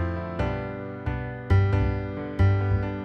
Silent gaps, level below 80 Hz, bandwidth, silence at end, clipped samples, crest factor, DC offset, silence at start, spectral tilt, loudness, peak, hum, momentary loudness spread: none; -34 dBFS; 5.8 kHz; 0 s; under 0.1%; 16 dB; under 0.1%; 0 s; -9.5 dB/octave; -26 LUFS; -10 dBFS; none; 10 LU